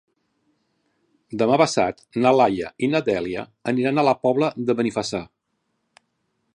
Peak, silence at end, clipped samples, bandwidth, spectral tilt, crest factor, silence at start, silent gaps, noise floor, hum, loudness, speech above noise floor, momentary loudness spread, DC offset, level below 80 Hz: -2 dBFS; 1.3 s; under 0.1%; 11.5 kHz; -5.5 dB/octave; 20 dB; 1.3 s; none; -74 dBFS; none; -21 LUFS; 53 dB; 11 LU; under 0.1%; -60 dBFS